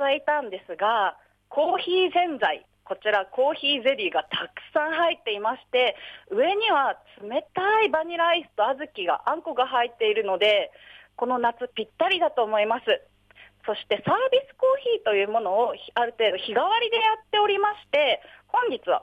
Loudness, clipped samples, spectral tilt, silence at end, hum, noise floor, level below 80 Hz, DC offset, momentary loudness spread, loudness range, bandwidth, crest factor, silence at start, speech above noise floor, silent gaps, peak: -24 LUFS; under 0.1%; -5 dB/octave; 0 s; none; -54 dBFS; -70 dBFS; under 0.1%; 8 LU; 2 LU; 9 kHz; 14 dB; 0 s; 30 dB; none; -10 dBFS